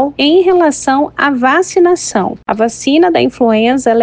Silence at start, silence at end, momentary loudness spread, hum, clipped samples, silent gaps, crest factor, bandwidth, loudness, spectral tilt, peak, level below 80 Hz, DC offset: 0 s; 0 s; 6 LU; none; under 0.1%; none; 10 dB; 9.8 kHz; -11 LUFS; -4 dB/octave; 0 dBFS; -46 dBFS; under 0.1%